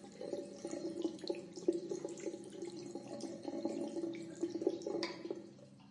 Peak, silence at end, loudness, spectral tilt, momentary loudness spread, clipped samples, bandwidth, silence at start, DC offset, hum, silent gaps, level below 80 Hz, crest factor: -20 dBFS; 0 s; -43 LUFS; -5 dB/octave; 9 LU; under 0.1%; 11 kHz; 0 s; under 0.1%; none; none; -86 dBFS; 22 dB